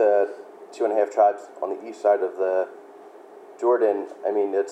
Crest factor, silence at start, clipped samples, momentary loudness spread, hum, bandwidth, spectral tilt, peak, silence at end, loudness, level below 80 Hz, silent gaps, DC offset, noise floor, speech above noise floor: 16 dB; 0 s; under 0.1%; 11 LU; none; 9.4 kHz; -4.5 dB/octave; -8 dBFS; 0 s; -24 LUFS; under -90 dBFS; none; under 0.1%; -45 dBFS; 23 dB